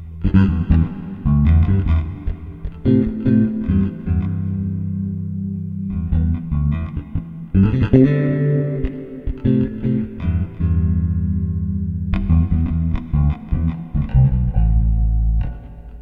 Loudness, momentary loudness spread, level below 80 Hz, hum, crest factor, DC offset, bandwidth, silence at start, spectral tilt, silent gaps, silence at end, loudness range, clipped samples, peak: -19 LUFS; 10 LU; -24 dBFS; none; 18 dB; under 0.1%; 3.9 kHz; 0 s; -11.5 dB/octave; none; 0 s; 3 LU; under 0.1%; 0 dBFS